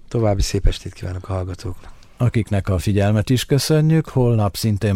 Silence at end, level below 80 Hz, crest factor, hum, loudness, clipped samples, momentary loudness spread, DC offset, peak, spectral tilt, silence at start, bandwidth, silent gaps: 0 s; -28 dBFS; 16 dB; none; -19 LUFS; under 0.1%; 13 LU; under 0.1%; -2 dBFS; -6.5 dB/octave; 0.1 s; 16 kHz; none